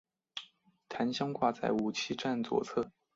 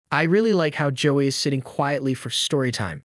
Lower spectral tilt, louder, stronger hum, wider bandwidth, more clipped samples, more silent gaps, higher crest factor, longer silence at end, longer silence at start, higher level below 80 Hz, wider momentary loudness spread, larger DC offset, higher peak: about the same, -5 dB/octave vs -5 dB/octave; second, -34 LUFS vs -22 LUFS; neither; second, 7.8 kHz vs 12 kHz; neither; neither; about the same, 20 dB vs 16 dB; first, 0.25 s vs 0.05 s; first, 0.35 s vs 0.1 s; second, -72 dBFS vs -64 dBFS; first, 14 LU vs 6 LU; neither; second, -16 dBFS vs -6 dBFS